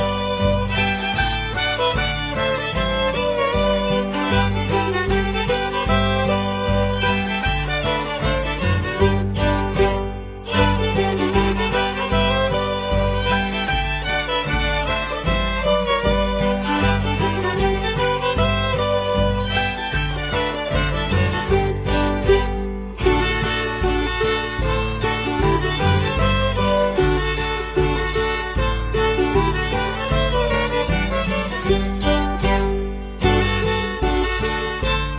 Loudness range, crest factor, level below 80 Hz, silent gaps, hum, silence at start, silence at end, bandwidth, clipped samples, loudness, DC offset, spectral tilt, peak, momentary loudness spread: 1 LU; 18 dB; -28 dBFS; none; none; 0 s; 0 s; 4 kHz; under 0.1%; -20 LUFS; under 0.1%; -10 dB/octave; -2 dBFS; 3 LU